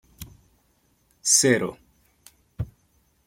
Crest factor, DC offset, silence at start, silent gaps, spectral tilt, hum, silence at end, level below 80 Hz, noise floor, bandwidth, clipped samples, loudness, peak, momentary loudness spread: 22 dB; under 0.1%; 0.2 s; none; -2.5 dB/octave; none; 0.6 s; -52 dBFS; -66 dBFS; 16.5 kHz; under 0.1%; -20 LUFS; -6 dBFS; 27 LU